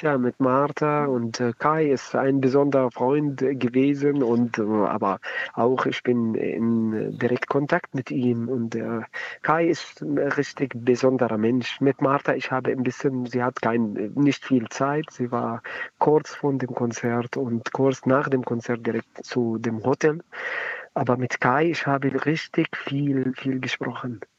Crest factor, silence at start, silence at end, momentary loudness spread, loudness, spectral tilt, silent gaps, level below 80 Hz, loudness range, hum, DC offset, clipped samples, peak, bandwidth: 18 dB; 0 s; 0.2 s; 7 LU; -24 LUFS; -6.5 dB/octave; none; -72 dBFS; 3 LU; none; under 0.1%; under 0.1%; -4 dBFS; 7.8 kHz